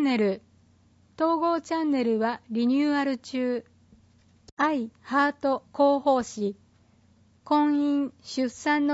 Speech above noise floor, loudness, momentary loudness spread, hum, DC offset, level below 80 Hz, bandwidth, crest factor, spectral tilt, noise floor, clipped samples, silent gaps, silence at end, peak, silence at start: 35 dB; -26 LUFS; 8 LU; none; under 0.1%; -68 dBFS; 8 kHz; 16 dB; -5 dB/octave; -60 dBFS; under 0.1%; 4.52-4.57 s; 0 s; -10 dBFS; 0 s